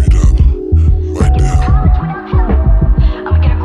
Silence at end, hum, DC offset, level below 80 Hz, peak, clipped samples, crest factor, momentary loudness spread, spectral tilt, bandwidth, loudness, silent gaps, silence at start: 0 s; none; under 0.1%; -10 dBFS; 0 dBFS; under 0.1%; 8 dB; 3 LU; -8 dB/octave; 9.4 kHz; -12 LUFS; none; 0 s